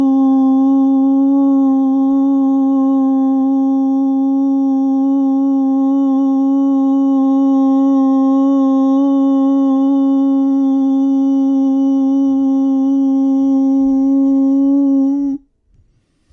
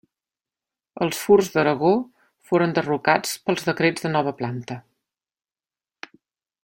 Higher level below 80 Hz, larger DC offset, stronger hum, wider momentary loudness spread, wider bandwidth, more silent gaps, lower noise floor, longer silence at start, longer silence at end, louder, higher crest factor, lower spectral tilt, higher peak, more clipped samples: first, -58 dBFS vs -64 dBFS; neither; neither; second, 2 LU vs 21 LU; second, 3.7 kHz vs 17 kHz; neither; second, -56 dBFS vs under -90 dBFS; second, 0 s vs 0.95 s; second, 0.95 s vs 1.85 s; first, -13 LUFS vs -21 LUFS; second, 6 dB vs 20 dB; first, -8 dB/octave vs -5 dB/octave; second, -6 dBFS vs -2 dBFS; neither